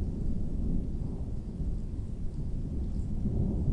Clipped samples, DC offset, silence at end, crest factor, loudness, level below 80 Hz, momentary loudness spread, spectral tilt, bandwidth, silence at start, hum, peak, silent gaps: under 0.1%; under 0.1%; 0 s; 14 dB; -36 LUFS; -34 dBFS; 7 LU; -10 dB/octave; 5 kHz; 0 s; none; -16 dBFS; none